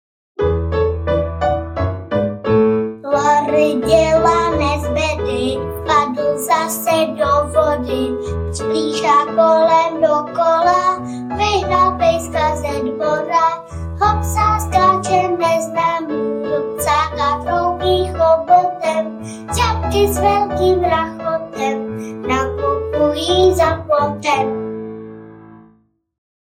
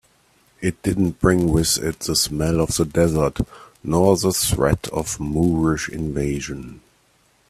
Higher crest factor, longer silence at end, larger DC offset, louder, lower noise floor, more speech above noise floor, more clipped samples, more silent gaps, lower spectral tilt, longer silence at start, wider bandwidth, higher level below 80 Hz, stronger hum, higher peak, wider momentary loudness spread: about the same, 16 dB vs 20 dB; first, 0.95 s vs 0.7 s; neither; first, -16 LUFS vs -20 LUFS; second, -55 dBFS vs -60 dBFS; about the same, 40 dB vs 40 dB; neither; neither; about the same, -5 dB/octave vs -5 dB/octave; second, 0.4 s vs 0.6 s; about the same, 16.5 kHz vs 15.5 kHz; about the same, -34 dBFS vs -36 dBFS; neither; about the same, -2 dBFS vs -2 dBFS; about the same, 8 LU vs 10 LU